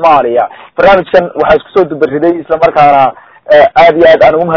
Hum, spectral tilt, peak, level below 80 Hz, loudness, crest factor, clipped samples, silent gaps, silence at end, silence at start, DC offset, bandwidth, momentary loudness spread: none; -7 dB/octave; 0 dBFS; -40 dBFS; -7 LUFS; 6 dB; 7%; none; 0 s; 0 s; under 0.1%; 6 kHz; 7 LU